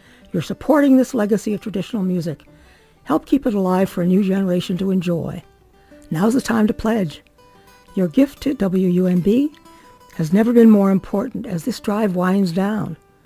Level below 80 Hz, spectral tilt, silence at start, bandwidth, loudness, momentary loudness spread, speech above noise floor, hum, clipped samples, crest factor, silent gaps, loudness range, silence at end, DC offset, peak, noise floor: -48 dBFS; -7.5 dB/octave; 0.35 s; 16 kHz; -18 LUFS; 12 LU; 31 dB; none; under 0.1%; 16 dB; none; 4 LU; 0.3 s; under 0.1%; -2 dBFS; -49 dBFS